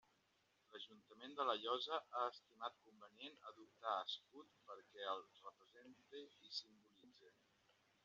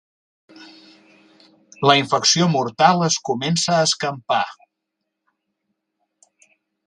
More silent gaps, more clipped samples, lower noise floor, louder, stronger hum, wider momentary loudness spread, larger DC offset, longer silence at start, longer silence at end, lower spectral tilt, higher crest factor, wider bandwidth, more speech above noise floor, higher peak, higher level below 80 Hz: neither; neither; about the same, -81 dBFS vs -79 dBFS; second, -48 LUFS vs -18 LUFS; neither; first, 23 LU vs 7 LU; neither; about the same, 0.7 s vs 0.6 s; second, 0.75 s vs 2.35 s; second, 1 dB/octave vs -3.5 dB/octave; about the same, 24 dB vs 22 dB; second, 7.4 kHz vs 11 kHz; second, 31 dB vs 61 dB; second, -28 dBFS vs 0 dBFS; second, under -90 dBFS vs -64 dBFS